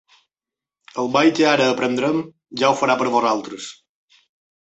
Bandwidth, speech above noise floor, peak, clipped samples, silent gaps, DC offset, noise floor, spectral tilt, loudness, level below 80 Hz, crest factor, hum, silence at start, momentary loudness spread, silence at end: 8.2 kHz; 71 dB; -4 dBFS; under 0.1%; none; under 0.1%; -89 dBFS; -4.5 dB/octave; -18 LUFS; -66 dBFS; 18 dB; none; 0.95 s; 17 LU; 0.95 s